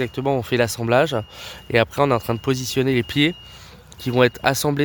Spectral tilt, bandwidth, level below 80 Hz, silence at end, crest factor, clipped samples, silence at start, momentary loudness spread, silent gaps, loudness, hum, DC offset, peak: -5 dB/octave; 19.5 kHz; -48 dBFS; 0 s; 20 dB; under 0.1%; 0 s; 12 LU; none; -20 LUFS; none; under 0.1%; 0 dBFS